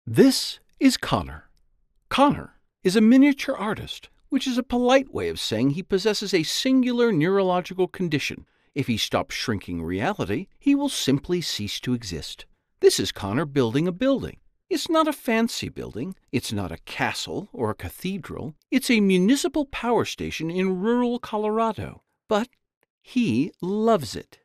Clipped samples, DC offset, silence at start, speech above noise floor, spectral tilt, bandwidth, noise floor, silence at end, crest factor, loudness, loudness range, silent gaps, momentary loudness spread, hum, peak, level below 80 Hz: under 0.1%; under 0.1%; 0.05 s; 40 dB; -5 dB/octave; 14.5 kHz; -63 dBFS; 0.2 s; 20 dB; -24 LUFS; 4 LU; 22.77-22.81 s, 22.90-23.01 s; 12 LU; none; -4 dBFS; -52 dBFS